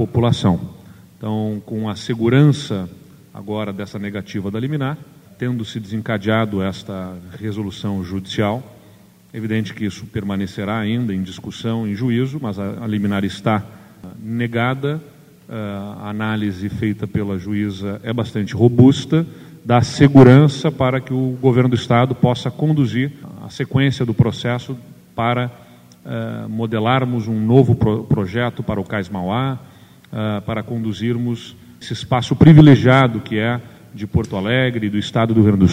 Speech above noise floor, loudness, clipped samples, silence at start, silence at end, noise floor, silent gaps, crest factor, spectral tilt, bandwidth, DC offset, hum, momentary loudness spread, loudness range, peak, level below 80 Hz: 30 dB; -18 LUFS; under 0.1%; 0 s; 0 s; -47 dBFS; none; 18 dB; -7.5 dB/octave; 15 kHz; under 0.1%; none; 16 LU; 10 LU; 0 dBFS; -46 dBFS